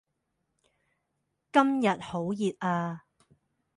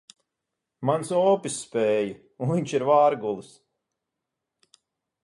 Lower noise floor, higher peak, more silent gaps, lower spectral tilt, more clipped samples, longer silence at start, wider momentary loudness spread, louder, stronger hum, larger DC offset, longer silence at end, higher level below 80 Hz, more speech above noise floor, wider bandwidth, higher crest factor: second, -80 dBFS vs -84 dBFS; about the same, -10 dBFS vs -8 dBFS; neither; about the same, -6.5 dB/octave vs -5.5 dB/octave; neither; first, 1.55 s vs 0.8 s; about the same, 10 LU vs 12 LU; second, -28 LUFS vs -24 LUFS; neither; neither; second, 0.8 s vs 1.85 s; about the same, -70 dBFS vs -70 dBFS; second, 53 dB vs 61 dB; about the same, 11 kHz vs 11.5 kHz; about the same, 22 dB vs 18 dB